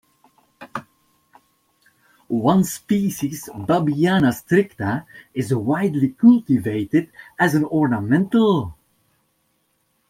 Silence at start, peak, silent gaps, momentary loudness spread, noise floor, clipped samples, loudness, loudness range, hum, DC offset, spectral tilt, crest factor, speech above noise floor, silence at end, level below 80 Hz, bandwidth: 0.6 s; -2 dBFS; none; 13 LU; -67 dBFS; under 0.1%; -19 LUFS; 6 LU; none; under 0.1%; -6.5 dB/octave; 18 dB; 49 dB; 1.35 s; -56 dBFS; 16.5 kHz